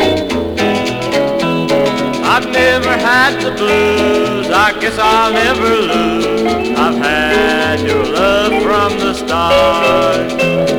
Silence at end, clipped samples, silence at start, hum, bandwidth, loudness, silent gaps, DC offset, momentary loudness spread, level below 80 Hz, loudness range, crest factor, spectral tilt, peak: 0 s; under 0.1%; 0 s; none; 19 kHz; -12 LUFS; none; 0.2%; 4 LU; -36 dBFS; 1 LU; 12 dB; -4.5 dB/octave; 0 dBFS